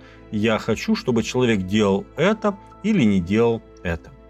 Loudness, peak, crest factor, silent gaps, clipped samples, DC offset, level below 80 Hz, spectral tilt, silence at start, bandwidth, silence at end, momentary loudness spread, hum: -21 LUFS; -6 dBFS; 16 dB; none; under 0.1%; under 0.1%; -48 dBFS; -6 dB/octave; 0.05 s; 12.5 kHz; 0.2 s; 10 LU; none